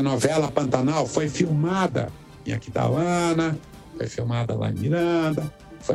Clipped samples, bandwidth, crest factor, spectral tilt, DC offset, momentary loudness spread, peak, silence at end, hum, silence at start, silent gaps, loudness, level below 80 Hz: under 0.1%; 13.5 kHz; 18 dB; -6 dB/octave; under 0.1%; 12 LU; -6 dBFS; 0 s; none; 0 s; none; -24 LUFS; -52 dBFS